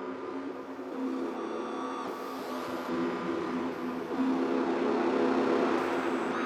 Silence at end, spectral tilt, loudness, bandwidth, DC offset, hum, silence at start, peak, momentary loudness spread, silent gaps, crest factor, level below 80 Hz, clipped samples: 0 s; -5.5 dB/octave; -32 LUFS; 14 kHz; under 0.1%; none; 0 s; -16 dBFS; 10 LU; none; 16 dB; -74 dBFS; under 0.1%